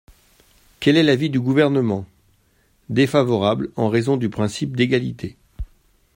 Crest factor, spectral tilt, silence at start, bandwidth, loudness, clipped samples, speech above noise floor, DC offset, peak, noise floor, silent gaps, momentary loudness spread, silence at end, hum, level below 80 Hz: 18 dB; -6.5 dB/octave; 0.8 s; 16 kHz; -19 LUFS; under 0.1%; 42 dB; under 0.1%; -2 dBFS; -60 dBFS; none; 18 LU; 0.5 s; none; -46 dBFS